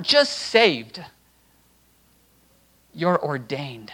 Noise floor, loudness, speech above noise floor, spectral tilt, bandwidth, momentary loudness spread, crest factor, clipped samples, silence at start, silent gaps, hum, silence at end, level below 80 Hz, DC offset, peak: -59 dBFS; -21 LUFS; 38 dB; -4 dB/octave; 19 kHz; 15 LU; 24 dB; under 0.1%; 0 s; none; none; 0 s; -66 dBFS; under 0.1%; -2 dBFS